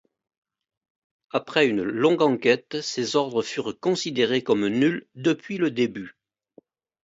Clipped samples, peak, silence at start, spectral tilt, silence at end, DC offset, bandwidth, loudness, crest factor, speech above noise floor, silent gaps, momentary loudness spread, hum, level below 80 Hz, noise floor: under 0.1%; -6 dBFS; 1.35 s; -5 dB/octave; 0.95 s; under 0.1%; 8 kHz; -24 LUFS; 20 dB; 34 dB; none; 9 LU; none; -68 dBFS; -57 dBFS